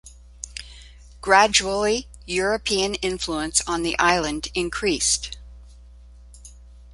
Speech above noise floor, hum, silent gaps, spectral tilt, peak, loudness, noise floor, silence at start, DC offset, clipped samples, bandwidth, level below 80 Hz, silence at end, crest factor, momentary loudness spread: 24 dB; 60 Hz at -40 dBFS; none; -2 dB/octave; -2 dBFS; -21 LUFS; -45 dBFS; 0.05 s; under 0.1%; under 0.1%; 11.5 kHz; -42 dBFS; 0 s; 22 dB; 18 LU